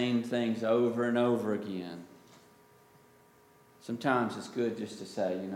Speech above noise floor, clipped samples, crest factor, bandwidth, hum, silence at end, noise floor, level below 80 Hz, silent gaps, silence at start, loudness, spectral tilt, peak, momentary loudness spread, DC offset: 30 dB; under 0.1%; 20 dB; 15.5 kHz; none; 0 s; -61 dBFS; -80 dBFS; none; 0 s; -32 LUFS; -6 dB/octave; -12 dBFS; 12 LU; under 0.1%